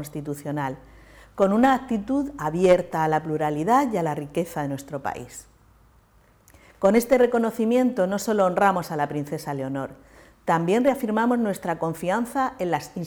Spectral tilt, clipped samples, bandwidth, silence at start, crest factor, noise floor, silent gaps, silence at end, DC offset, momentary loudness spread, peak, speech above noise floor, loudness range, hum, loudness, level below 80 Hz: -6 dB/octave; under 0.1%; over 20 kHz; 0 s; 20 dB; -57 dBFS; none; 0 s; under 0.1%; 12 LU; -4 dBFS; 34 dB; 5 LU; none; -23 LUFS; -54 dBFS